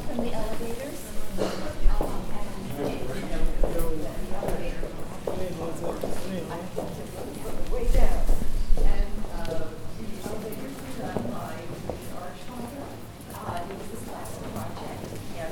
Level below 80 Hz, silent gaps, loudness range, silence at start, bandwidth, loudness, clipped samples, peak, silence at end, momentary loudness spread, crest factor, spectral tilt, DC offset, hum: -28 dBFS; none; 5 LU; 0 s; 15.5 kHz; -33 LUFS; under 0.1%; -6 dBFS; 0 s; 8 LU; 18 dB; -5.5 dB/octave; under 0.1%; none